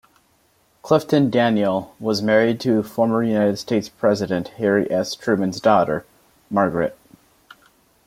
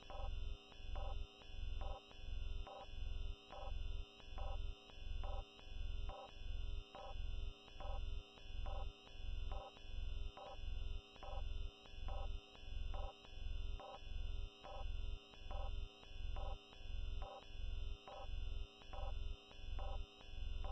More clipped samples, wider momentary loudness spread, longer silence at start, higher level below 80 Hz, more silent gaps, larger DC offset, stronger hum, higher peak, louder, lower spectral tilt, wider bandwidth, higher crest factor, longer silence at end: neither; about the same, 7 LU vs 5 LU; first, 0.85 s vs 0 s; second, -58 dBFS vs -46 dBFS; neither; neither; neither; first, -2 dBFS vs -32 dBFS; first, -20 LUFS vs -52 LUFS; about the same, -6 dB/octave vs -5.5 dB/octave; first, 16 kHz vs 6.2 kHz; about the same, 18 dB vs 14 dB; first, 1.15 s vs 0 s